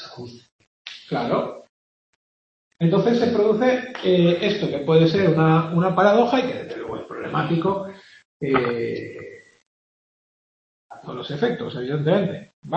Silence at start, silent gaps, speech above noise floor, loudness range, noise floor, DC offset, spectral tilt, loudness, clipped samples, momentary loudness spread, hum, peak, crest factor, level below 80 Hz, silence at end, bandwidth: 0 s; 0.52-0.59 s, 0.67-0.85 s, 1.69-2.71 s, 8.25-8.40 s, 9.66-10.89 s, 12.53-12.62 s; over 70 dB; 11 LU; under -90 dBFS; under 0.1%; -7.5 dB/octave; -21 LUFS; under 0.1%; 19 LU; none; -2 dBFS; 20 dB; -62 dBFS; 0 s; 6.6 kHz